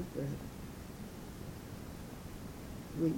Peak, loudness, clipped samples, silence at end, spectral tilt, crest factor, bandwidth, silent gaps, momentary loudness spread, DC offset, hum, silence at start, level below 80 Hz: -22 dBFS; -45 LUFS; under 0.1%; 0 s; -6.5 dB/octave; 20 dB; 17 kHz; none; 7 LU; under 0.1%; none; 0 s; -54 dBFS